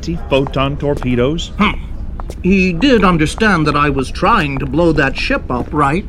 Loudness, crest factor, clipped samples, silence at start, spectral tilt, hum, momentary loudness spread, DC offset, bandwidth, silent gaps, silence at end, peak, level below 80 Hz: -14 LUFS; 14 dB; under 0.1%; 0 s; -6 dB/octave; none; 7 LU; under 0.1%; 12 kHz; none; 0 s; 0 dBFS; -24 dBFS